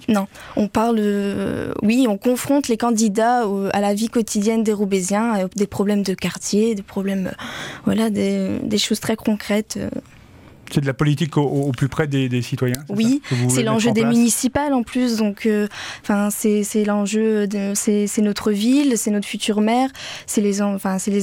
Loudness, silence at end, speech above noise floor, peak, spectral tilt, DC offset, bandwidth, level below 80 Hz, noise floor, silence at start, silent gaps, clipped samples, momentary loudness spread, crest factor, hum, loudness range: -20 LUFS; 0 s; 25 dB; -2 dBFS; -5 dB/octave; under 0.1%; 17 kHz; -50 dBFS; -44 dBFS; 0 s; none; under 0.1%; 7 LU; 16 dB; none; 3 LU